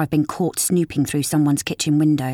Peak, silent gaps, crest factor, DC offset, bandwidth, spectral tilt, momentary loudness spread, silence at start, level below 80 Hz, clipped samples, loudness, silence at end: -6 dBFS; none; 12 dB; under 0.1%; 17.5 kHz; -5 dB/octave; 3 LU; 0 s; -54 dBFS; under 0.1%; -20 LUFS; 0 s